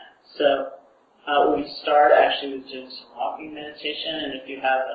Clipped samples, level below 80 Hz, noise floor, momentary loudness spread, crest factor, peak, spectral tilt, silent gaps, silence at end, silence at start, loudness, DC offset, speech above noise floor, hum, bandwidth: under 0.1%; -62 dBFS; -54 dBFS; 19 LU; 20 dB; -4 dBFS; -6.5 dB/octave; none; 0 s; 0 s; -22 LUFS; under 0.1%; 31 dB; none; 5 kHz